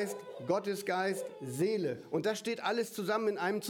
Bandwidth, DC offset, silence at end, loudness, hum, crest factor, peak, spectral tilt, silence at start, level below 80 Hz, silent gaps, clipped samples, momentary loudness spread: 19 kHz; under 0.1%; 0 s; -34 LUFS; none; 16 dB; -18 dBFS; -4.5 dB/octave; 0 s; -82 dBFS; none; under 0.1%; 6 LU